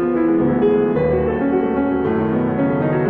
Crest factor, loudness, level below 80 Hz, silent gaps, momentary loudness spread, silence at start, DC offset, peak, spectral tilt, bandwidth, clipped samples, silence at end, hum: 10 dB; -18 LUFS; -40 dBFS; none; 3 LU; 0 s; under 0.1%; -6 dBFS; -11.5 dB/octave; 4.3 kHz; under 0.1%; 0 s; none